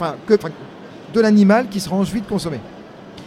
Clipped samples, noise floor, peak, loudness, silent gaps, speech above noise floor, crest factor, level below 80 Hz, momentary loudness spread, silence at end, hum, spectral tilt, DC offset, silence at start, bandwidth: under 0.1%; -37 dBFS; 0 dBFS; -17 LUFS; none; 21 dB; 18 dB; -50 dBFS; 25 LU; 0 s; none; -6.5 dB/octave; under 0.1%; 0 s; 14.5 kHz